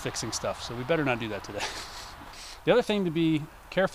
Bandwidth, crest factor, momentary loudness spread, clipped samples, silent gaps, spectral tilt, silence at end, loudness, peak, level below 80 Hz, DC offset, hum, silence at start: 15.5 kHz; 18 dB; 16 LU; under 0.1%; none; -4.5 dB/octave; 0 s; -29 LUFS; -10 dBFS; -52 dBFS; under 0.1%; none; 0 s